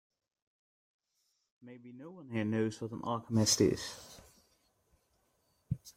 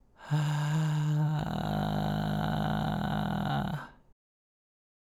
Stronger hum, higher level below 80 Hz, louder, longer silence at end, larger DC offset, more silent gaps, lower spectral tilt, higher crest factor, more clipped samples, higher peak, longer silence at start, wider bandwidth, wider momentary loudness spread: neither; second, -64 dBFS vs -50 dBFS; about the same, -33 LUFS vs -31 LUFS; second, 0.05 s vs 1.2 s; neither; neither; second, -4.5 dB/octave vs -7 dB/octave; first, 22 dB vs 14 dB; neither; first, -14 dBFS vs -18 dBFS; first, 1.65 s vs 0.2 s; first, 16 kHz vs 13 kHz; first, 23 LU vs 4 LU